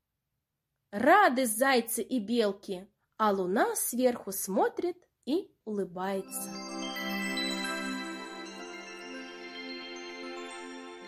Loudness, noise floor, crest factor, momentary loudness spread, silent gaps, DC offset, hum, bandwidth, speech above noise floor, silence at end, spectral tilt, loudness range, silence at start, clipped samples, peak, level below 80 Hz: -30 LUFS; -85 dBFS; 22 dB; 16 LU; none; under 0.1%; none; 16 kHz; 56 dB; 0 s; -3 dB/octave; 9 LU; 0.9 s; under 0.1%; -10 dBFS; -76 dBFS